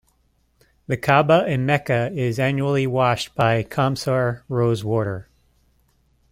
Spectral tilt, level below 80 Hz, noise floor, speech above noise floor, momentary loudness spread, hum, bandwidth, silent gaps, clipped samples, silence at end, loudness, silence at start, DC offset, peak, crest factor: -6.5 dB/octave; -52 dBFS; -64 dBFS; 44 dB; 6 LU; none; 16 kHz; none; under 0.1%; 1.1 s; -21 LUFS; 0.9 s; under 0.1%; -2 dBFS; 20 dB